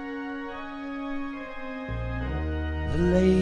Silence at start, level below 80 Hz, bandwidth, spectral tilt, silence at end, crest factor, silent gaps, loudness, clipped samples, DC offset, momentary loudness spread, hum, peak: 0 s; -38 dBFS; 9.8 kHz; -8 dB/octave; 0 s; 18 dB; none; -30 LUFS; under 0.1%; under 0.1%; 13 LU; none; -10 dBFS